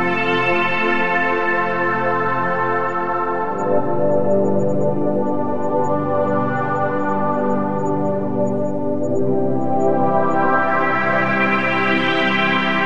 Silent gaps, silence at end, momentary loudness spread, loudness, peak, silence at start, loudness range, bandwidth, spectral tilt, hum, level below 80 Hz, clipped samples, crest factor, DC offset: none; 0 s; 4 LU; -18 LUFS; -4 dBFS; 0 s; 3 LU; 8.4 kHz; -7 dB/octave; none; -54 dBFS; under 0.1%; 14 dB; 5%